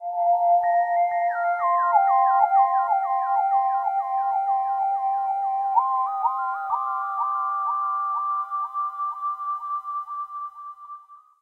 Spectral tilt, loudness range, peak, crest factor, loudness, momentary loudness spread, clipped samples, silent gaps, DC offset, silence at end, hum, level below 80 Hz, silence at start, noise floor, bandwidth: -2.5 dB/octave; 7 LU; -8 dBFS; 16 dB; -23 LUFS; 12 LU; under 0.1%; none; under 0.1%; 0.25 s; none; -80 dBFS; 0 s; -45 dBFS; 3.2 kHz